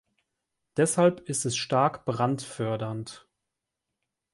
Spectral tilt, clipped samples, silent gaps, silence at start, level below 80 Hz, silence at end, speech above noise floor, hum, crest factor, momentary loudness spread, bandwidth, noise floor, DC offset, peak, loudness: -5 dB/octave; under 0.1%; none; 0.75 s; -66 dBFS; 1.15 s; 59 dB; none; 20 dB; 12 LU; 12 kHz; -85 dBFS; under 0.1%; -10 dBFS; -27 LUFS